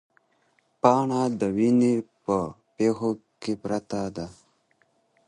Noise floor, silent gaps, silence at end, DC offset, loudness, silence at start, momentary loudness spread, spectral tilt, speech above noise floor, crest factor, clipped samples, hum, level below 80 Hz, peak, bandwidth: -68 dBFS; none; 0.95 s; under 0.1%; -25 LUFS; 0.85 s; 13 LU; -7 dB/octave; 44 dB; 24 dB; under 0.1%; none; -60 dBFS; -2 dBFS; 10.5 kHz